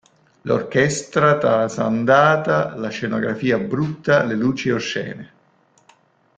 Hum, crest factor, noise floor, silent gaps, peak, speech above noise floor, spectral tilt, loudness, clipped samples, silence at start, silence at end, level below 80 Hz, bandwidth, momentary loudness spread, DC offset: none; 18 dB; -58 dBFS; none; 0 dBFS; 40 dB; -5.5 dB/octave; -19 LUFS; under 0.1%; 0.45 s; 1.1 s; -56 dBFS; 9.4 kHz; 10 LU; under 0.1%